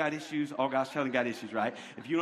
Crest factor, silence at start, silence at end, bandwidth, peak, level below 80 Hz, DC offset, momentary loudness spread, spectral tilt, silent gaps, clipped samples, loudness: 18 dB; 0 s; 0 s; 13.5 kHz; -14 dBFS; -76 dBFS; under 0.1%; 4 LU; -5.5 dB/octave; none; under 0.1%; -32 LUFS